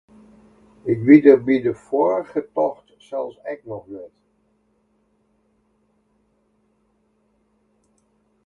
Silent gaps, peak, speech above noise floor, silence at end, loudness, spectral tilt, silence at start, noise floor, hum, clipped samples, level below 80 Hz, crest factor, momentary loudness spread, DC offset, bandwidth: none; 0 dBFS; 47 dB; 4.4 s; -18 LUFS; -9 dB/octave; 0.85 s; -65 dBFS; none; under 0.1%; -64 dBFS; 22 dB; 23 LU; under 0.1%; 5.8 kHz